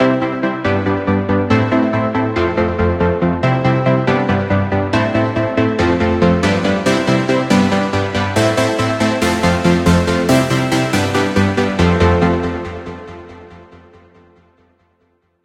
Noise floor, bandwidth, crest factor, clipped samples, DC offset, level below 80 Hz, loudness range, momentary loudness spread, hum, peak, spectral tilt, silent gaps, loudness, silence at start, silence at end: -61 dBFS; 16 kHz; 16 dB; under 0.1%; under 0.1%; -38 dBFS; 3 LU; 4 LU; none; 0 dBFS; -6 dB/octave; none; -15 LUFS; 0 s; 1.7 s